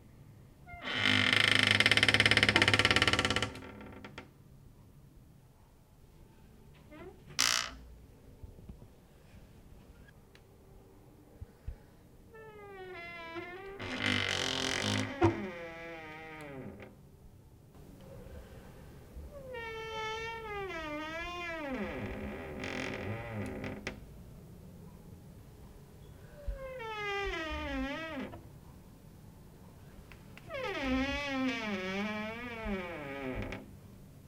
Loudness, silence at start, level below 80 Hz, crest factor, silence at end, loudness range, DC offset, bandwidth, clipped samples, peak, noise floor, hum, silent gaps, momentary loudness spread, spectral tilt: -32 LUFS; 0 s; -54 dBFS; 30 dB; 0 s; 23 LU; under 0.1%; 17 kHz; under 0.1%; -6 dBFS; -60 dBFS; none; none; 29 LU; -3 dB/octave